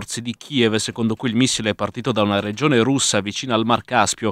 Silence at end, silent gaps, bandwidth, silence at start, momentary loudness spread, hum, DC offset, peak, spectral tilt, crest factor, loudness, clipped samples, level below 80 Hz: 0 s; none; 14.5 kHz; 0 s; 6 LU; none; under 0.1%; 0 dBFS; -4 dB/octave; 20 dB; -19 LUFS; under 0.1%; -56 dBFS